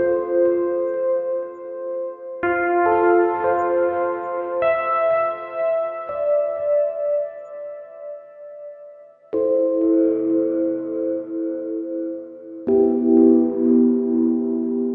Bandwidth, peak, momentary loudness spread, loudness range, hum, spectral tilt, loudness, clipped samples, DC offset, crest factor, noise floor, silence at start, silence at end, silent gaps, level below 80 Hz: 3.5 kHz; -4 dBFS; 17 LU; 5 LU; none; -9.5 dB/octave; -20 LUFS; under 0.1%; under 0.1%; 16 dB; -44 dBFS; 0 s; 0 s; none; -62 dBFS